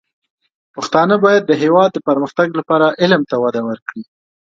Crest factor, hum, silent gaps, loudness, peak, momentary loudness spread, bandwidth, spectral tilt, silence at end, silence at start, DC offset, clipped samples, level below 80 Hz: 16 dB; none; 3.82-3.86 s; -14 LUFS; 0 dBFS; 15 LU; 7.8 kHz; -6 dB/octave; 0.5 s; 0.75 s; under 0.1%; under 0.1%; -62 dBFS